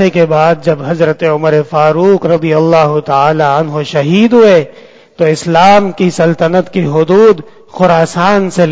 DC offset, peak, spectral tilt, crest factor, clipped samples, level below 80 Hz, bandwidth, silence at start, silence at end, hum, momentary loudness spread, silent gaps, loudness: under 0.1%; 0 dBFS; -6.5 dB/octave; 8 dB; 1%; -48 dBFS; 8 kHz; 0 s; 0 s; none; 7 LU; none; -9 LUFS